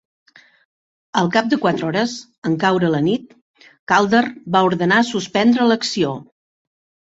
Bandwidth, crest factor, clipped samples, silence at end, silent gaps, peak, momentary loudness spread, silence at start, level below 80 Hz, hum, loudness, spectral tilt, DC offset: 8 kHz; 18 dB; under 0.1%; 0.9 s; 2.38-2.42 s, 3.42-3.54 s, 3.79-3.87 s; -2 dBFS; 9 LU; 1.15 s; -60 dBFS; none; -18 LUFS; -5 dB/octave; under 0.1%